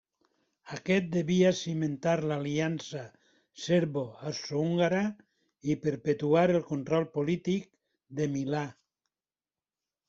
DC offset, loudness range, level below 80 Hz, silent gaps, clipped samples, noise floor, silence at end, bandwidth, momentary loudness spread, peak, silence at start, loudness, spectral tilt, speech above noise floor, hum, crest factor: under 0.1%; 3 LU; -68 dBFS; none; under 0.1%; under -90 dBFS; 1.35 s; 7.6 kHz; 14 LU; -12 dBFS; 0.65 s; -30 LUFS; -6.5 dB/octave; over 61 dB; none; 18 dB